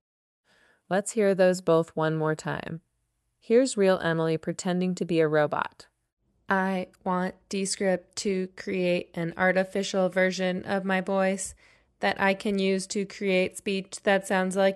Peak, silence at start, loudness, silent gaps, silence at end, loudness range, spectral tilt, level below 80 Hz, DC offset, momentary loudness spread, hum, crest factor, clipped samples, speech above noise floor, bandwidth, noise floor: -10 dBFS; 0.9 s; -27 LUFS; 6.13-6.17 s; 0 s; 2 LU; -5 dB/octave; -66 dBFS; under 0.1%; 8 LU; none; 18 dB; under 0.1%; 50 dB; 12.5 kHz; -76 dBFS